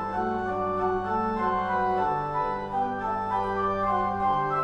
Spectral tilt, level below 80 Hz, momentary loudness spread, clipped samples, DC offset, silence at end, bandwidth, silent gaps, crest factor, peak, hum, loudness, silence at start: -7.5 dB/octave; -48 dBFS; 3 LU; under 0.1%; under 0.1%; 0 s; 8.4 kHz; none; 12 dB; -14 dBFS; none; -27 LUFS; 0 s